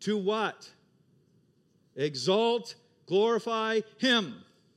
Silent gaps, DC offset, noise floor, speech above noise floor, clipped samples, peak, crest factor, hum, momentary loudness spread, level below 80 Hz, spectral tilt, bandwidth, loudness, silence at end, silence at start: none; under 0.1%; -67 dBFS; 39 dB; under 0.1%; -12 dBFS; 18 dB; none; 19 LU; -88 dBFS; -4.5 dB/octave; 12 kHz; -28 LUFS; 0.35 s; 0 s